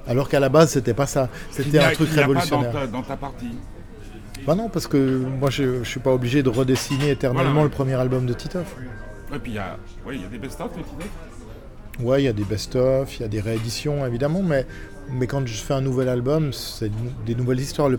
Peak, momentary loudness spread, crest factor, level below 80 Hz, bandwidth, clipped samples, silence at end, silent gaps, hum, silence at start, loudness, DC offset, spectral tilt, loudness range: -4 dBFS; 18 LU; 18 dB; -38 dBFS; 18.5 kHz; under 0.1%; 0 s; none; none; 0 s; -22 LUFS; under 0.1%; -6 dB/octave; 7 LU